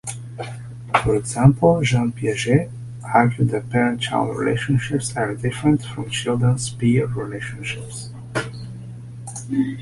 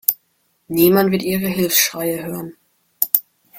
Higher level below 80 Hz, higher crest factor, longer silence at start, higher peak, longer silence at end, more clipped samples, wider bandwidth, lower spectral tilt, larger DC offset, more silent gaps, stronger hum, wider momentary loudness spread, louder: first, -46 dBFS vs -56 dBFS; about the same, 20 dB vs 20 dB; about the same, 0.05 s vs 0.1 s; about the same, -2 dBFS vs 0 dBFS; about the same, 0 s vs 0 s; neither; second, 11.5 kHz vs 17 kHz; first, -6 dB/octave vs -4 dB/octave; neither; neither; neither; about the same, 16 LU vs 15 LU; second, -20 LUFS vs -17 LUFS